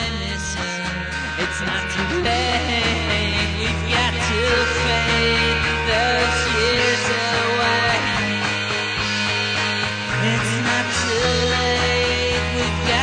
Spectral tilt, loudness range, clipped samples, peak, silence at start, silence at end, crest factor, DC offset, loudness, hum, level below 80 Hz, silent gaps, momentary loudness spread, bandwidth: -3.5 dB/octave; 3 LU; under 0.1%; -6 dBFS; 0 s; 0 s; 14 dB; under 0.1%; -19 LUFS; none; -32 dBFS; none; 6 LU; 10 kHz